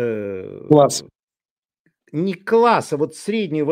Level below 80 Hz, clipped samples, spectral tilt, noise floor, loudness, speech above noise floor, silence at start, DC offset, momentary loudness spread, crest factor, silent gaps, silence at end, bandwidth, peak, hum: -66 dBFS; under 0.1%; -5.5 dB/octave; under -90 dBFS; -19 LUFS; over 73 dB; 0 s; under 0.1%; 14 LU; 18 dB; 1.23-1.28 s, 1.45-1.63 s, 1.79-1.85 s; 0 s; 16 kHz; 0 dBFS; none